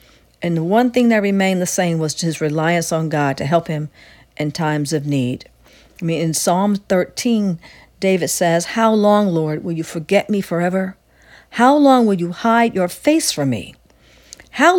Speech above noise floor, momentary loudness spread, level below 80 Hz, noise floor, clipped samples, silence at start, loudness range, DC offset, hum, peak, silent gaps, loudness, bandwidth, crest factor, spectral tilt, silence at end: 33 dB; 11 LU; -54 dBFS; -50 dBFS; under 0.1%; 0.4 s; 4 LU; under 0.1%; none; 0 dBFS; none; -17 LUFS; 18 kHz; 16 dB; -5 dB/octave; 0 s